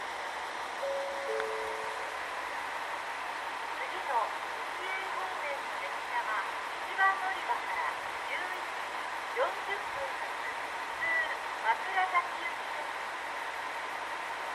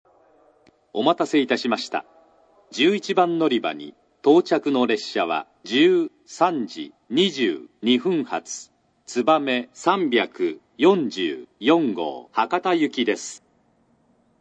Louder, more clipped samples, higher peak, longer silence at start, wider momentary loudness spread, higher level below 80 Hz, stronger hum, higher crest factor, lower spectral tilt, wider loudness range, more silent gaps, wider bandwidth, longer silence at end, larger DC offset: second, -34 LUFS vs -22 LUFS; neither; second, -14 dBFS vs -2 dBFS; second, 0 s vs 0.95 s; second, 7 LU vs 11 LU; first, -70 dBFS vs -78 dBFS; neither; about the same, 20 dB vs 20 dB; second, -1 dB/octave vs -4.5 dB/octave; about the same, 3 LU vs 2 LU; neither; first, 15 kHz vs 9 kHz; second, 0 s vs 1.05 s; neither